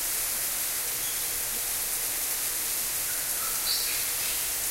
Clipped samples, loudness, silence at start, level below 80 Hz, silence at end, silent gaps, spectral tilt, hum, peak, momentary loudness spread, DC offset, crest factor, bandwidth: under 0.1%; -26 LUFS; 0 s; -52 dBFS; 0 s; none; 1 dB/octave; none; -12 dBFS; 2 LU; under 0.1%; 16 dB; 16 kHz